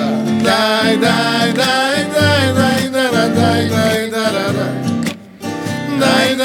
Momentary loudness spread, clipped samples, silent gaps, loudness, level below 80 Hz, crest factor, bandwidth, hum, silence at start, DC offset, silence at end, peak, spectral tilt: 8 LU; under 0.1%; none; -14 LUFS; -56 dBFS; 14 dB; 19 kHz; none; 0 s; under 0.1%; 0 s; 0 dBFS; -4.5 dB/octave